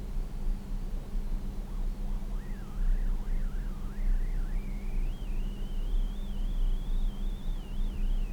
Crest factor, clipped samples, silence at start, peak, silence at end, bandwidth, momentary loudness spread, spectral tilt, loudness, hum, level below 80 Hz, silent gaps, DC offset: 10 dB; under 0.1%; 0 s; -20 dBFS; 0 s; 4.8 kHz; 5 LU; -6.5 dB/octave; -38 LUFS; none; -30 dBFS; none; under 0.1%